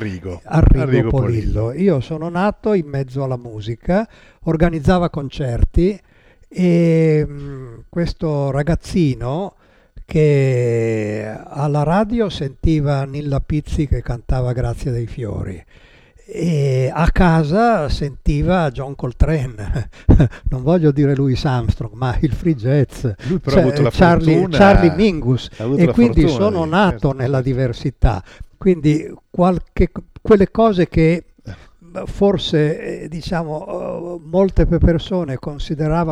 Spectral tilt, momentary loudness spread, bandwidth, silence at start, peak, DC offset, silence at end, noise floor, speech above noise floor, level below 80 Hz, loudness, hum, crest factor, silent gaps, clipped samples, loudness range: -8 dB/octave; 12 LU; 10.5 kHz; 0 s; -2 dBFS; under 0.1%; 0 s; -36 dBFS; 20 dB; -26 dBFS; -17 LUFS; none; 16 dB; none; under 0.1%; 6 LU